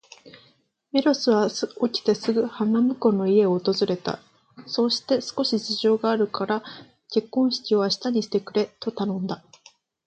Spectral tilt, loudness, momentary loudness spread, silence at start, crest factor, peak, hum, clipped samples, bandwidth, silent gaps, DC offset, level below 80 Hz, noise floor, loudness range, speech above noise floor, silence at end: -5.5 dB/octave; -24 LUFS; 9 LU; 0.25 s; 18 dB; -6 dBFS; none; under 0.1%; 8.8 kHz; none; under 0.1%; -70 dBFS; -62 dBFS; 3 LU; 39 dB; 0.7 s